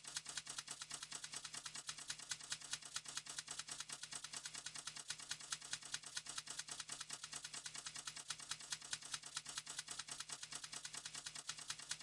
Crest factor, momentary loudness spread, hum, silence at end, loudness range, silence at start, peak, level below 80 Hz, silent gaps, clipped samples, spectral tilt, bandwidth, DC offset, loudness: 24 dB; 2 LU; none; 0 s; 0 LU; 0 s; -26 dBFS; -82 dBFS; none; under 0.1%; 1 dB/octave; 12 kHz; under 0.1%; -48 LUFS